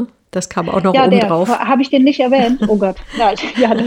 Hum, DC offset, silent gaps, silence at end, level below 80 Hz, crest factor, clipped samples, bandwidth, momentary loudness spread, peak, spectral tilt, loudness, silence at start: none; under 0.1%; none; 0 s; -42 dBFS; 14 dB; under 0.1%; 15 kHz; 8 LU; 0 dBFS; -5.5 dB/octave; -14 LUFS; 0 s